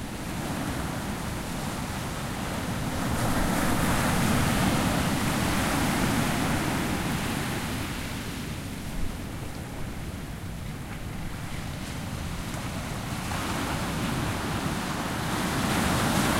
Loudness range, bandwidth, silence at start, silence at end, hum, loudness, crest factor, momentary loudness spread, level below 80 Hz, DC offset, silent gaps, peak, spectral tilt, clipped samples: 10 LU; 16 kHz; 0 s; 0 s; none; -29 LUFS; 16 dB; 11 LU; -38 dBFS; under 0.1%; none; -12 dBFS; -4.5 dB/octave; under 0.1%